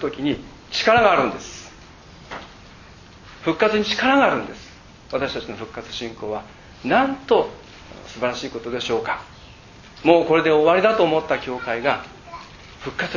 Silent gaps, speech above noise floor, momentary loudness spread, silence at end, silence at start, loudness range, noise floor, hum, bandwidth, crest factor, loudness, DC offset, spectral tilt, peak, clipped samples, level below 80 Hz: none; 24 dB; 22 LU; 0 s; 0 s; 5 LU; -44 dBFS; none; 7.4 kHz; 22 dB; -20 LUFS; under 0.1%; -4.5 dB/octave; 0 dBFS; under 0.1%; -50 dBFS